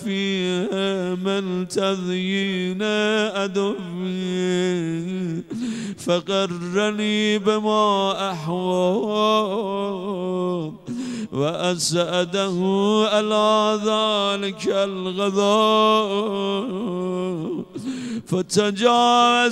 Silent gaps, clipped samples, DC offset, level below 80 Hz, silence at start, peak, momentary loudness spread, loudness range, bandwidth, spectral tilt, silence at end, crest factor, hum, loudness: none; under 0.1%; under 0.1%; -64 dBFS; 0 s; -4 dBFS; 10 LU; 4 LU; 13 kHz; -4.5 dB/octave; 0 s; 18 dB; none; -21 LUFS